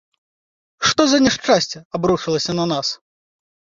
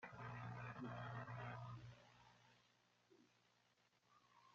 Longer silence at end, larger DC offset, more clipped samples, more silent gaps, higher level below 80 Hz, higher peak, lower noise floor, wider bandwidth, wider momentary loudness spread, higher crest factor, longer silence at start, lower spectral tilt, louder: first, 0.8 s vs 0 s; neither; neither; first, 1.85-1.91 s vs none; first, -52 dBFS vs -78 dBFS; first, -2 dBFS vs -40 dBFS; first, under -90 dBFS vs -80 dBFS; about the same, 7.6 kHz vs 7.4 kHz; second, 9 LU vs 14 LU; about the same, 18 dB vs 18 dB; first, 0.8 s vs 0 s; second, -3.5 dB/octave vs -5.5 dB/octave; first, -18 LUFS vs -54 LUFS